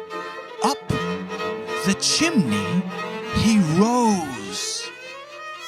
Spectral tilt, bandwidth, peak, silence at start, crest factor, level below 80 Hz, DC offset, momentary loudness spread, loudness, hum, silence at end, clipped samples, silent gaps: -4 dB/octave; 14.5 kHz; -6 dBFS; 0 s; 18 dB; -48 dBFS; under 0.1%; 15 LU; -22 LUFS; none; 0 s; under 0.1%; none